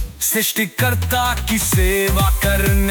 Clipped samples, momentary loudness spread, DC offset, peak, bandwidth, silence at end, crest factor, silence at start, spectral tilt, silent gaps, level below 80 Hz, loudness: under 0.1%; 2 LU; under 0.1%; -4 dBFS; 19.5 kHz; 0 s; 12 dB; 0 s; -4 dB/octave; none; -22 dBFS; -17 LUFS